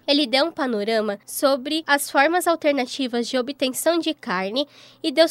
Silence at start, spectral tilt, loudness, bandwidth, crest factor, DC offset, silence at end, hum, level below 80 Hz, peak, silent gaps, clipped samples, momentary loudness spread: 0.1 s; -2.5 dB/octave; -22 LUFS; 16 kHz; 18 dB; under 0.1%; 0 s; none; -76 dBFS; -4 dBFS; none; under 0.1%; 7 LU